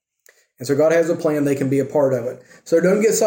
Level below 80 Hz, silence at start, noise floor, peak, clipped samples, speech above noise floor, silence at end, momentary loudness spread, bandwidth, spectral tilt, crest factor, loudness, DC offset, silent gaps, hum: -66 dBFS; 0.6 s; -57 dBFS; -6 dBFS; under 0.1%; 39 dB; 0 s; 12 LU; 17 kHz; -5.5 dB/octave; 14 dB; -18 LUFS; under 0.1%; none; none